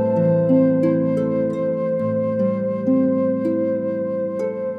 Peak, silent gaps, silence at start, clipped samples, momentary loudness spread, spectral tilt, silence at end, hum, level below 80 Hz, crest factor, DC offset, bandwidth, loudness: -6 dBFS; none; 0 s; under 0.1%; 7 LU; -11 dB/octave; 0 s; none; -62 dBFS; 12 dB; under 0.1%; 5 kHz; -20 LUFS